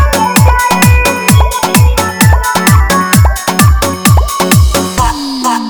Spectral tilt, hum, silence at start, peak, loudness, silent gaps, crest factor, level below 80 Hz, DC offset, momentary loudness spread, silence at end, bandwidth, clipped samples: -4.5 dB/octave; none; 0 s; 0 dBFS; -8 LUFS; none; 8 dB; -14 dBFS; under 0.1%; 4 LU; 0 s; over 20 kHz; 1%